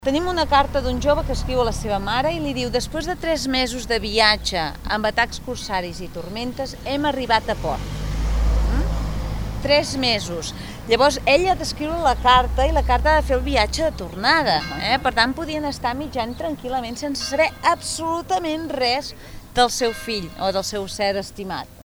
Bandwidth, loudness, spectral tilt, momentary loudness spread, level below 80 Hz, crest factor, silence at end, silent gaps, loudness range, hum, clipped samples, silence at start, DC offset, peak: over 20 kHz; -21 LUFS; -4 dB/octave; 11 LU; -30 dBFS; 20 dB; 0.05 s; none; 5 LU; none; under 0.1%; 0 s; under 0.1%; 0 dBFS